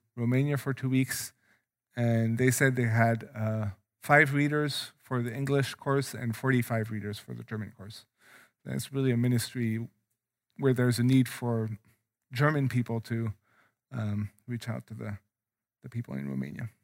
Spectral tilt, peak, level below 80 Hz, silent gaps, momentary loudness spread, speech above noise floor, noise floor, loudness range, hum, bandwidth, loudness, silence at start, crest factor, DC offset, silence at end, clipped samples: -6 dB/octave; -8 dBFS; -70 dBFS; none; 16 LU; over 61 dB; under -90 dBFS; 7 LU; none; 16 kHz; -29 LUFS; 0.15 s; 22 dB; under 0.1%; 0.15 s; under 0.1%